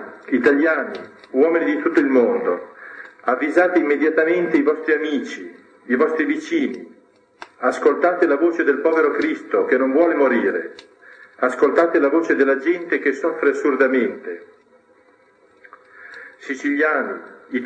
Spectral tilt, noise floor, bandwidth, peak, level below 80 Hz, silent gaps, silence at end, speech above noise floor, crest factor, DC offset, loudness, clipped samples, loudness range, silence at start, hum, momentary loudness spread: -5.5 dB/octave; -55 dBFS; 9 kHz; -2 dBFS; -76 dBFS; none; 0 s; 36 dB; 16 dB; under 0.1%; -19 LUFS; under 0.1%; 5 LU; 0 s; none; 16 LU